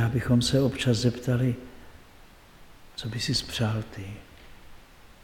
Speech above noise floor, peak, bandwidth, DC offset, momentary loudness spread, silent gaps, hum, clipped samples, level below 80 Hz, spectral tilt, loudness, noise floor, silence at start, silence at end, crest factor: 25 dB; -10 dBFS; 16.5 kHz; under 0.1%; 18 LU; none; none; under 0.1%; -48 dBFS; -5.5 dB/octave; -26 LUFS; -51 dBFS; 0 s; 0.1 s; 18 dB